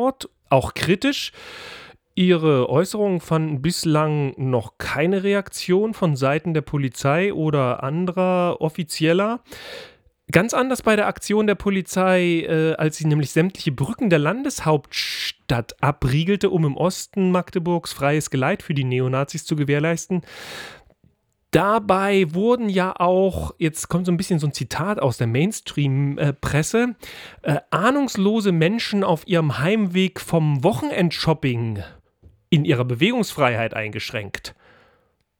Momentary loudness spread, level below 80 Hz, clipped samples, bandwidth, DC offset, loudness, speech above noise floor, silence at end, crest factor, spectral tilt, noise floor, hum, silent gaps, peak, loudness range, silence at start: 8 LU; -48 dBFS; under 0.1%; 19 kHz; under 0.1%; -21 LUFS; 43 dB; 0.9 s; 20 dB; -6 dB/octave; -63 dBFS; none; none; 0 dBFS; 2 LU; 0 s